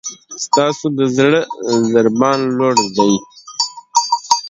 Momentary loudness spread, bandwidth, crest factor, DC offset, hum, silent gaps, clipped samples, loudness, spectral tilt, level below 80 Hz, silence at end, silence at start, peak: 7 LU; 11 kHz; 16 dB; under 0.1%; none; none; under 0.1%; -15 LUFS; -4 dB/octave; -60 dBFS; 0 s; 0.05 s; 0 dBFS